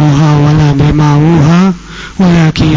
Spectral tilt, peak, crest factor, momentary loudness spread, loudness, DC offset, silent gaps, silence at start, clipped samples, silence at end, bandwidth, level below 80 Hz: -7.5 dB/octave; 0 dBFS; 6 dB; 6 LU; -7 LUFS; under 0.1%; none; 0 s; 0.4%; 0 s; 7.6 kHz; -26 dBFS